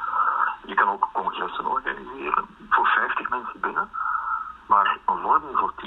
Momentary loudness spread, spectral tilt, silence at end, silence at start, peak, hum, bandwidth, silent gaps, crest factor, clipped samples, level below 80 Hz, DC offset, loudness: 8 LU; -5.5 dB/octave; 0 s; 0 s; -4 dBFS; none; 4.1 kHz; none; 20 dB; under 0.1%; -58 dBFS; under 0.1%; -24 LUFS